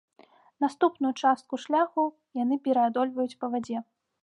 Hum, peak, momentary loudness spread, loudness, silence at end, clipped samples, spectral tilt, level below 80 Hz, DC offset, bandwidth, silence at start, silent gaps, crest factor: none; -10 dBFS; 7 LU; -28 LUFS; 0.4 s; under 0.1%; -5 dB/octave; -80 dBFS; under 0.1%; 10.5 kHz; 0.6 s; none; 18 dB